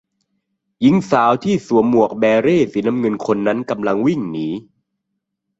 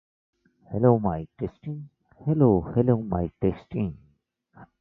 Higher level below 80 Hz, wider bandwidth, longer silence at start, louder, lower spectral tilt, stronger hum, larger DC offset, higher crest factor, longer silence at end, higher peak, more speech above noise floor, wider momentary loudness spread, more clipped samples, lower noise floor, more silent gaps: second, -56 dBFS vs -46 dBFS; first, 8 kHz vs 4 kHz; about the same, 0.8 s vs 0.7 s; first, -17 LUFS vs -25 LUFS; second, -7 dB/octave vs -13 dB/octave; neither; neither; about the same, 16 dB vs 20 dB; first, 1 s vs 0.15 s; first, -2 dBFS vs -6 dBFS; first, 60 dB vs 43 dB; second, 8 LU vs 14 LU; neither; first, -76 dBFS vs -67 dBFS; neither